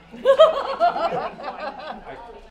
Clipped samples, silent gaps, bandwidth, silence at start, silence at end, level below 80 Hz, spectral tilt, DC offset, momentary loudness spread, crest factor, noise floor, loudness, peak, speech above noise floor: under 0.1%; none; 10 kHz; 0.15 s; 0.05 s; -52 dBFS; -4.5 dB/octave; under 0.1%; 21 LU; 20 dB; -39 dBFS; -19 LUFS; -2 dBFS; 20 dB